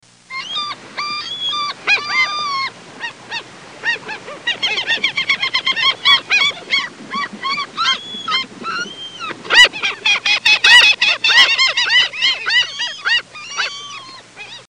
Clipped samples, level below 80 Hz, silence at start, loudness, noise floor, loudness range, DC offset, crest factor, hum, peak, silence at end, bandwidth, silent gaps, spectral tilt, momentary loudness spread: under 0.1%; -60 dBFS; 0.3 s; -14 LUFS; -36 dBFS; 9 LU; 0.1%; 18 dB; none; 0 dBFS; 0.05 s; 16 kHz; none; 0.5 dB/octave; 18 LU